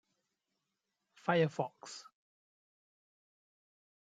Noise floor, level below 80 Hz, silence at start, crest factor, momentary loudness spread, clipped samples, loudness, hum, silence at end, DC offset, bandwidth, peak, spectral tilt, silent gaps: -87 dBFS; -84 dBFS; 1.25 s; 24 dB; 17 LU; under 0.1%; -35 LUFS; none; 2 s; under 0.1%; 9.2 kHz; -18 dBFS; -6 dB/octave; none